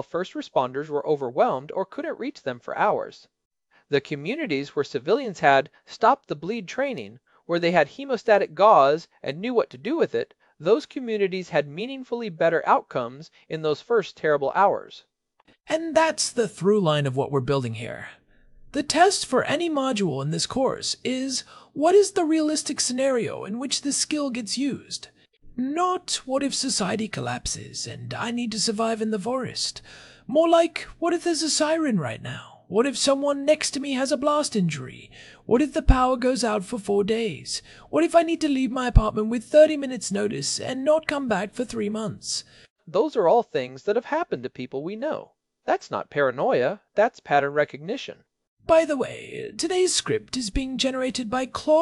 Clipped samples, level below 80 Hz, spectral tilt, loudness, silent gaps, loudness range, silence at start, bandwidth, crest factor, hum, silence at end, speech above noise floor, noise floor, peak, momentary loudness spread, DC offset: under 0.1%; -38 dBFS; -4 dB/octave; -24 LUFS; 3.45-3.51 s, 42.70-42.76 s, 48.48-48.57 s; 5 LU; 0 s; 12 kHz; 24 dB; none; 0 s; 39 dB; -63 dBFS; 0 dBFS; 12 LU; under 0.1%